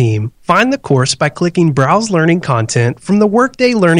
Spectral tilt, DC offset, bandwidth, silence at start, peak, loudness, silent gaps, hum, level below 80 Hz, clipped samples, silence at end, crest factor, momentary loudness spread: -5.5 dB/octave; under 0.1%; 10.5 kHz; 0 s; 0 dBFS; -13 LUFS; none; none; -48 dBFS; 0.3%; 0 s; 12 dB; 3 LU